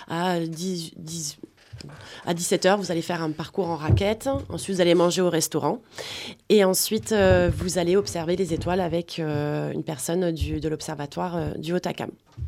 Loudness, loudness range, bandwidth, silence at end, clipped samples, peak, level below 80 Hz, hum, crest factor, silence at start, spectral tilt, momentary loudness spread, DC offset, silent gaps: -25 LUFS; 5 LU; 16 kHz; 0 s; under 0.1%; -6 dBFS; -42 dBFS; none; 18 dB; 0 s; -5 dB/octave; 14 LU; under 0.1%; none